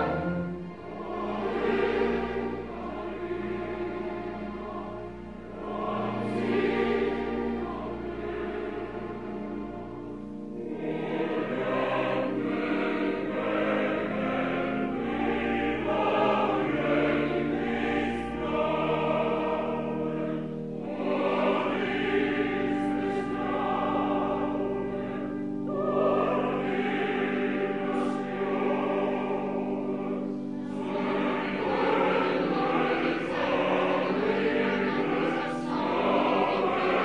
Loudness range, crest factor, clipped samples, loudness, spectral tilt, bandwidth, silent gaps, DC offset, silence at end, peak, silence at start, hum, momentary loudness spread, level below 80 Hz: 6 LU; 16 dB; under 0.1%; -29 LUFS; -7 dB/octave; 10.5 kHz; none; 0.2%; 0 s; -12 dBFS; 0 s; none; 10 LU; -54 dBFS